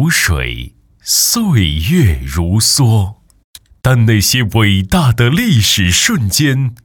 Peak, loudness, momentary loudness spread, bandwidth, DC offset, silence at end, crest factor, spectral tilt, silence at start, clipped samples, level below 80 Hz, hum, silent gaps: 0 dBFS; -12 LUFS; 8 LU; 18.5 kHz; under 0.1%; 0.1 s; 12 dB; -4 dB/octave; 0 s; under 0.1%; -28 dBFS; none; 3.44-3.54 s